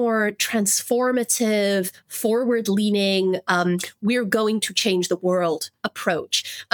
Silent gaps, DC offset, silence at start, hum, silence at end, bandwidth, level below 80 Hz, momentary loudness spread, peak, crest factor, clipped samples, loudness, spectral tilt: none; under 0.1%; 0 s; none; 0.1 s; 19.5 kHz; -74 dBFS; 5 LU; -2 dBFS; 20 dB; under 0.1%; -21 LUFS; -3.5 dB/octave